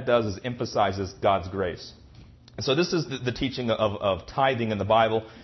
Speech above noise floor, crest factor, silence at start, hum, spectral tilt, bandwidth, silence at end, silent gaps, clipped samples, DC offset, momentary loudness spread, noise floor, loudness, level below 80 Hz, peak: 24 dB; 18 dB; 0 s; none; -5.5 dB/octave; 6.2 kHz; 0 s; none; under 0.1%; under 0.1%; 9 LU; -50 dBFS; -26 LUFS; -52 dBFS; -8 dBFS